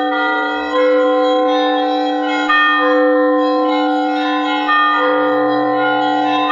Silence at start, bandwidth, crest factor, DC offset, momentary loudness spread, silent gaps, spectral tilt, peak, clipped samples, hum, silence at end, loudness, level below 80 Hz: 0 s; 7.2 kHz; 12 dB; under 0.1%; 4 LU; none; -4.5 dB/octave; -2 dBFS; under 0.1%; none; 0 s; -14 LUFS; -64 dBFS